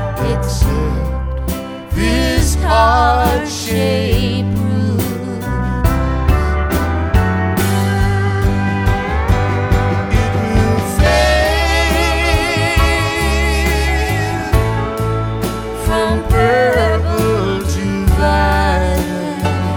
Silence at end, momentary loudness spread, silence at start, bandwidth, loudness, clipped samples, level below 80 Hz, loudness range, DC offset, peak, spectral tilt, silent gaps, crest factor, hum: 0 s; 7 LU; 0 s; 19.5 kHz; -15 LUFS; under 0.1%; -20 dBFS; 3 LU; under 0.1%; 0 dBFS; -5.5 dB/octave; none; 14 dB; none